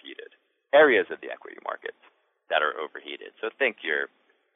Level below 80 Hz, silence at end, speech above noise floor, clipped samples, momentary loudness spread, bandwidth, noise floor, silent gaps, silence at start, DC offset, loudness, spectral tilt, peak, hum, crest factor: -86 dBFS; 0.5 s; 37 dB; under 0.1%; 20 LU; 4 kHz; -62 dBFS; none; 0.05 s; under 0.1%; -25 LUFS; -6.5 dB/octave; -8 dBFS; none; 20 dB